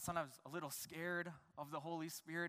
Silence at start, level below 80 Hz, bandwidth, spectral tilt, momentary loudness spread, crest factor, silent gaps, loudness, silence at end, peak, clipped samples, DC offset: 0 s; -78 dBFS; 15.5 kHz; -4 dB/octave; 6 LU; 20 dB; none; -47 LUFS; 0 s; -26 dBFS; under 0.1%; under 0.1%